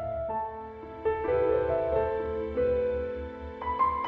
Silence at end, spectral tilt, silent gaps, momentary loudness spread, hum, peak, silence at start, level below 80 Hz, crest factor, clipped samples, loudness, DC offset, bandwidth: 0 s; -9 dB/octave; none; 11 LU; none; -16 dBFS; 0 s; -46 dBFS; 14 dB; under 0.1%; -30 LUFS; under 0.1%; 4.7 kHz